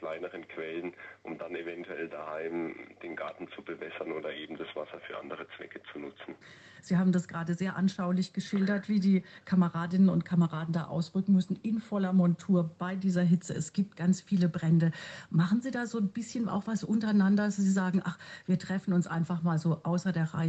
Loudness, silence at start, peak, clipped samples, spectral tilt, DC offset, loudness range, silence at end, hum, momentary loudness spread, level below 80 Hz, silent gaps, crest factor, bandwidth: -31 LUFS; 0 s; -16 dBFS; under 0.1%; -7.5 dB/octave; under 0.1%; 11 LU; 0 s; none; 15 LU; -74 dBFS; none; 14 dB; 8.4 kHz